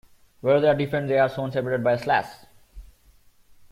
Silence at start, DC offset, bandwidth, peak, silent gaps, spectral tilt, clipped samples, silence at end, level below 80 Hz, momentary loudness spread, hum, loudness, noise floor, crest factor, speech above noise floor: 0.45 s; under 0.1%; 15.5 kHz; -8 dBFS; none; -7 dB/octave; under 0.1%; 0.9 s; -54 dBFS; 8 LU; none; -23 LUFS; -56 dBFS; 18 dB; 34 dB